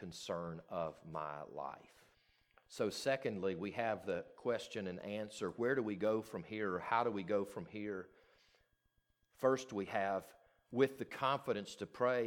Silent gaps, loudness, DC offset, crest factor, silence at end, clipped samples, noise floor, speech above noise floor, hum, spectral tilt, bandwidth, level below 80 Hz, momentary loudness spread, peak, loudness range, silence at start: none; -40 LUFS; under 0.1%; 22 dB; 0 s; under 0.1%; -80 dBFS; 40 dB; none; -5.5 dB/octave; 18.5 kHz; -76 dBFS; 10 LU; -18 dBFS; 3 LU; 0 s